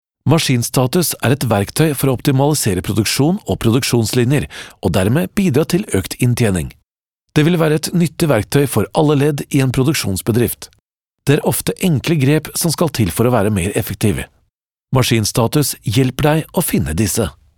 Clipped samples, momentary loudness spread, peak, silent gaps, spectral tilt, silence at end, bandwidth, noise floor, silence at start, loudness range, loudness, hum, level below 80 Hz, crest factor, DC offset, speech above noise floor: under 0.1%; 4 LU; 0 dBFS; 6.93-7.17 s, 10.82-11.08 s, 14.50-14.77 s; -5.5 dB/octave; 0.25 s; 19.5 kHz; -73 dBFS; 0.25 s; 2 LU; -16 LUFS; none; -40 dBFS; 16 dB; 0.2%; 58 dB